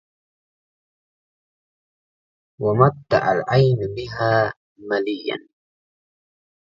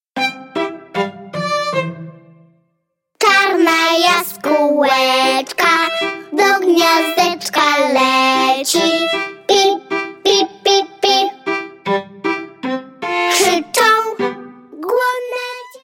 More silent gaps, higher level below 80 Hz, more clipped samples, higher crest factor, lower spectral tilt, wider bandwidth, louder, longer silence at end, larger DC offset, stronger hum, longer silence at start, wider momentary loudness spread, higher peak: first, 4.56-4.76 s vs none; first, -54 dBFS vs -66 dBFS; neither; first, 22 dB vs 16 dB; first, -8 dB/octave vs -2.5 dB/octave; second, 7.2 kHz vs 17 kHz; second, -20 LUFS vs -15 LUFS; first, 1.3 s vs 0.05 s; neither; neither; first, 2.6 s vs 0.15 s; about the same, 11 LU vs 11 LU; about the same, 0 dBFS vs 0 dBFS